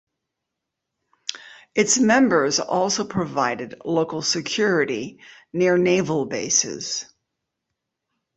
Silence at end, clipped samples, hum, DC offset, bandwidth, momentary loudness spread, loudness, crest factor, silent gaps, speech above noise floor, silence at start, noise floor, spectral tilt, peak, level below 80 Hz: 1.35 s; under 0.1%; none; under 0.1%; 8.4 kHz; 15 LU; -21 LUFS; 20 dB; none; 61 dB; 1.3 s; -82 dBFS; -3 dB/octave; -4 dBFS; -62 dBFS